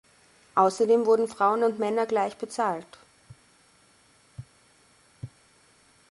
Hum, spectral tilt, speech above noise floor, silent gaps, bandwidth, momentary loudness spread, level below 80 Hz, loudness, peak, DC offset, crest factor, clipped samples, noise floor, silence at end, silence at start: none; -5.5 dB/octave; 36 dB; none; 11.5 kHz; 24 LU; -68 dBFS; -25 LUFS; -8 dBFS; under 0.1%; 20 dB; under 0.1%; -61 dBFS; 0.85 s; 0.55 s